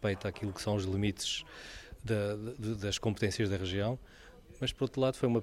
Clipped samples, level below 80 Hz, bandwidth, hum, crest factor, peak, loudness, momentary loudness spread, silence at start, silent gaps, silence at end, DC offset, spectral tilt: under 0.1%; -56 dBFS; 13.5 kHz; none; 18 dB; -16 dBFS; -34 LUFS; 8 LU; 0 s; none; 0 s; under 0.1%; -5 dB/octave